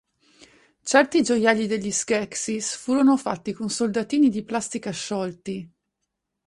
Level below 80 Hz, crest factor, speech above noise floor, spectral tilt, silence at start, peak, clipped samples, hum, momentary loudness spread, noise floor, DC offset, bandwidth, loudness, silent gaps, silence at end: -64 dBFS; 20 dB; 57 dB; -3.5 dB/octave; 0.85 s; -4 dBFS; under 0.1%; none; 10 LU; -80 dBFS; under 0.1%; 11.5 kHz; -23 LUFS; none; 0.8 s